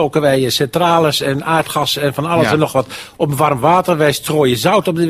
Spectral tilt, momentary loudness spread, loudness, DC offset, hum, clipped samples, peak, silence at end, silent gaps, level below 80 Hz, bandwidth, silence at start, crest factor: -5 dB/octave; 5 LU; -14 LUFS; under 0.1%; none; under 0.1%; 0 dBFS; 0 s; none; -48 dBFS; 16 kHz; 0 s; 14 dB